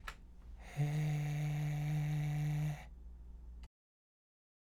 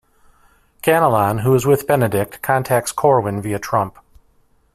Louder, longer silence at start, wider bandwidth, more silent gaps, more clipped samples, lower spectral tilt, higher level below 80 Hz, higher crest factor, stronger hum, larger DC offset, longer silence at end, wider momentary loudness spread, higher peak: second, -38 LUFS vs -17 LUFS; second, 0 s vs 0.85 s; second, 14 kHz vs 16 kHz; neither; neither; about the same, -7 dB/octave vs -6 dB/octave; about the same, -54 dBFS vs -50 dBFS; about the same, 14 dB vs 18 dB; neither; neither; about the same, 0.95 s vs 0.85 s; first, 19 LU vs 7 LU; second, -26 dBFS vs -2 dBFS